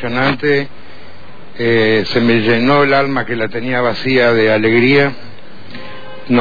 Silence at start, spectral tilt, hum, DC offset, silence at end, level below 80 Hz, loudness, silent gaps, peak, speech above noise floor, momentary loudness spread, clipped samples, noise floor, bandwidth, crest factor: 0 s; -7.5 dB/octave; none; 6%; 0 s; -48 dBFS; -13 LUFS; none; -2 dBFS; 25 dB; 20 LU; under 0.1%; -38 dBFS; 5 kHz; 12 dB